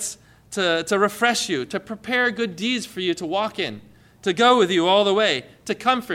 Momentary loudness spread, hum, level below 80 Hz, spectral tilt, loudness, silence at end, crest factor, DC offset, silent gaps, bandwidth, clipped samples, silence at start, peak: 13 LU; none; -62 dBFS; -3 dB/octave; -21 LUFS; 0 s; 16 dB; under 0.1%; none; 16.5 kHz; under 0.1%; 0 s; -6 dBFS